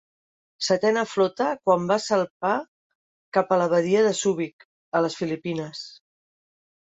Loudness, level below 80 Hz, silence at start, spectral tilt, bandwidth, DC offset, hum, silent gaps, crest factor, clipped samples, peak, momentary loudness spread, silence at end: -24 LUFS; -70 dBFS; 0.6 s; -4.5 dB/octave; 8.4 kHz; under 0.1%; none; 2.30-2.40 s, 2.68-3.32 s, 4.53-4.59 s, 4.65-4.92 s; 18 dB; under 0.1%; -6 dBFS; 10 LU; 0.95 s